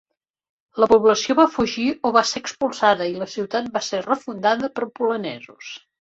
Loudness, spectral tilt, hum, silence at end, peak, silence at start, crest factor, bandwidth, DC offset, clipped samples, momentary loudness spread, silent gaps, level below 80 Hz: -20 LUFS; -3.5 dB/octave; none; 0.35 s; -2 dBFS; 0.75 s; 18 dB; 8 kHz; under 0.1%; under 0.1%; 17 LU; none; -58 dBFS